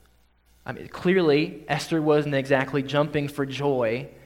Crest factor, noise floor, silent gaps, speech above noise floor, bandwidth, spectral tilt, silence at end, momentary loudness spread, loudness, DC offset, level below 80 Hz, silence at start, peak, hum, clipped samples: 18 dB; -60 dBFS; none; 36 dB; 16 kHz; -6.5 dB/octave; 0.15 s; 11 LU; -24 LUFS; under 0.1%; -58 dBFS; 0.65 s; -6 dBFS; none; under 0.1%